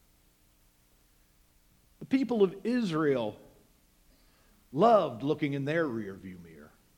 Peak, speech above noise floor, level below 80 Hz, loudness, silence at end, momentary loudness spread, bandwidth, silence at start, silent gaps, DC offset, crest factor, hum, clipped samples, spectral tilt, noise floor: -10 dBFS; 37 dB; -66 dBFS; -29 LUFS; 0.3 s; 20 LU; 17.5 kHz; 2 s; none; under 0.1%; 22 dB; none; under 0.1%; -7.5 dB/octave; -65 dBFS